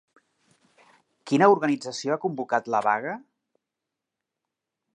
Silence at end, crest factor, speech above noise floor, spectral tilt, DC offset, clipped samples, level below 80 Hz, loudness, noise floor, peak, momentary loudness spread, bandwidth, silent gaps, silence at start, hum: 1.75 s; 24 dB; 62 dB; -5.5 dB/octave; under 0.1%; under 0.1%; -82 dBFS; -24 LUFS; -86 dBFS; -4 dBFS; 10 LU; 10.5 kHz; none; 1.25 s; none